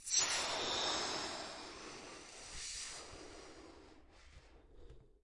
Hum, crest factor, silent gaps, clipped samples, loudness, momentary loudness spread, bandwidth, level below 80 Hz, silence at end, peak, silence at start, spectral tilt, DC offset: none; 24 dB; none; under 0.1%; -39 LUFS; 21 LU; 11.5 kHz; -64 dBFS; 0.1 s; -20 dBFS; 0 s; 0 dB/octave; under 0.1%